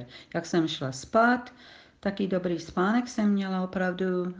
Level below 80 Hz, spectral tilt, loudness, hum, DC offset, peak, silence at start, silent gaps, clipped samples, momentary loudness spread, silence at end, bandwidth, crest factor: -62 dBFS; -6 dB/octave; -28 LUFS; none; under 0.1%; -12 dBFS; 0 s; none; under 0.1%; 10 LU; 0 s; 9.4 kHz; 16 dB